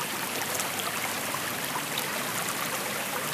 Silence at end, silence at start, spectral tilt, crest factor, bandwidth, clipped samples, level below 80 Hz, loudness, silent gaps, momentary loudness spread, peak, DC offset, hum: 0 s; 0 s; -1.5 dB/octave; 20 dB; 16 kHz; under 0.1%; -68 dBFS; -29 LUFS; none; 1 LU; -10 dBFS; under 0.1%; none